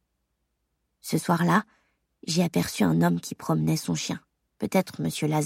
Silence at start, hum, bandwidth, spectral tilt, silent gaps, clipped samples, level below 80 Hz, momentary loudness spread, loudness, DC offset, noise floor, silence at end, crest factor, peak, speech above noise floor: 1.05 s; none; 16.5 kHz; -5.5 dB/octave; none; under 0.1%; -62 dBFS; 11 LU; -26 LUFS; under 0.1%; -77 dBFS; 0 s; 20 dB; -6 dBFS; 52 dB